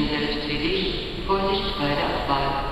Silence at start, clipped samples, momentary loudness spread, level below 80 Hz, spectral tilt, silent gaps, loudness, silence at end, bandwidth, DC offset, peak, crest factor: 0 s; under 0.1%; 2 LU; -34 dBFS; -6 dB/octave; none; -24 LUFS; 0 s; 12.5 kHz; under 0.1%; -8 dBFS; 16 dB